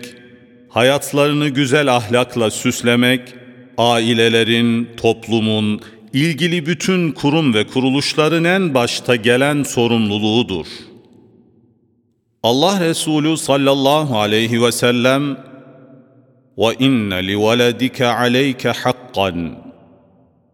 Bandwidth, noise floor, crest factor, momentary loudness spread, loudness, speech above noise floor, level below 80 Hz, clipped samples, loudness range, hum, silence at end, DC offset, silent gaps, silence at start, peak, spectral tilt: 18 kHz; -62 dBFS; 16 dB; 6 LU; -16 LUFS; 47 dB; -56 dBFS; under 0.1%; 3 LU; none; 0.85 s; under 0.1%; none; 0 s; 0 dBFS; -4.5 dB/octave